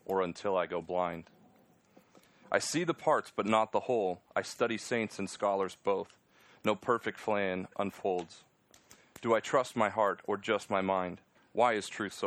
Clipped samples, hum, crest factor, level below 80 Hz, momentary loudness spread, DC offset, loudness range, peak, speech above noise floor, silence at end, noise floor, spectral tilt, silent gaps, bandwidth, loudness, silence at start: under 0.1%; none; 22 dB; -76 dBFS; 8 LU; under 0.1%; 3 LU; -12 dBFS; 32 dB; 0 s; -65 dBFS; -4.5 dB/octave; none; 15.5 kHz; -33 LUFS; 0.1 s